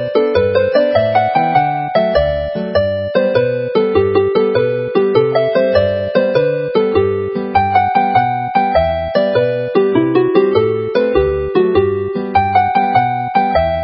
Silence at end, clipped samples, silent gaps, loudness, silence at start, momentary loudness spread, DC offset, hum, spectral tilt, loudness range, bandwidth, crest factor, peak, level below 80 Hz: 0 s; under 0.1%; none; -14 LUFS; 0 s; 3 LU; under 0.1%; none; -10.5 dB/octave; 1 LU; 5.8 kHz; 14 dB; 0 dBFS; -34 dBFS